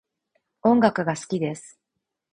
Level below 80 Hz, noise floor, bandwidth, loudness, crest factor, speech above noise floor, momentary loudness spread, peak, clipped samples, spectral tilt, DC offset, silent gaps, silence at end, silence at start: -62 dBFS; -82 dBFS; 10.5 kHz; -23 LUFS; 22 dB; 60 dB; 11 LU; -4 dBFS; under 0.1%; -6 dB/octave; under 0.1%; none; 0.65 s; 0.65 s